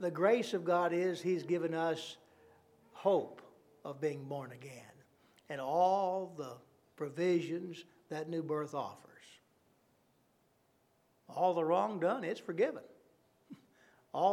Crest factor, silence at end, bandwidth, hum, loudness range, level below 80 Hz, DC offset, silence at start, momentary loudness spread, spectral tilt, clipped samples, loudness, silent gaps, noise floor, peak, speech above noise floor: 20 dB; 0 s; 14 kHz; none; 6 LU; -90 dBFS; under 0.1%; 0 s; 18 LU; -6 dB/octave; under 0.1%; -35 LUFS; none; -73 dBFS; -18 dBFS; 39 dB